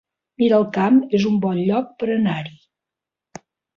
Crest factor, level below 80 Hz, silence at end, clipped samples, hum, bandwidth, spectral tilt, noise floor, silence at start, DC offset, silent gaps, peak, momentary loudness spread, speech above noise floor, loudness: 16 dB; -62 dBFS; 1.25 s; under 0.1%; none; 7.2 kHz; -7.5 dB/octave; -87 dBFS; 0.4 s; under 0.1%; none; -4 dBFS; 7 LU; 69 dB; -19 LUFS